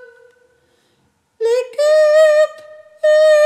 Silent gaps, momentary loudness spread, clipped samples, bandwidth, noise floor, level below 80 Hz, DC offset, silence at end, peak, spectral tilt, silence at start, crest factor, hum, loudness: none; 9 LU; under 0.1%; 10 kHz; -61 dBFS; -80 dBFS; under 0.1%; 0 s; -2 dBFS; 1 dB/octave; 1.4 s; 12 dB; none; -13 LUFS